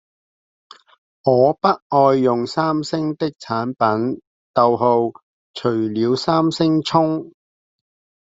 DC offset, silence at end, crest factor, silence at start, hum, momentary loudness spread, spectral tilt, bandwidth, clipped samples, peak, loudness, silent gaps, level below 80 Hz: under 0.1%; 0.95 s; 18 dB; 1.25 s; none; 9 LU; -7 dB/octave; 7.8 kHz; under 0.1%; -2 dBFS; -18 LUFS; 1.82-1.90 s, 4.27-4.54 s, 5.23-5.54 s; -62 dBFS